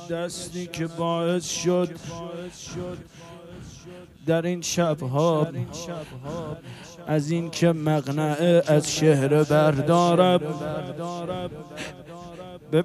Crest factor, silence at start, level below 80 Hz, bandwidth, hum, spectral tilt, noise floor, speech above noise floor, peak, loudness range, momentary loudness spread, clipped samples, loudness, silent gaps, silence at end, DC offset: 20 dB; 0 s; -56 dBFS; 14 kHz; none; -5.5 dB/octave; -44 dBFS; 20 dB; -4 dBFS; 9 LU; 21 LU; under 0.1%; -24 LUFS; none; 0 s; under 0.1%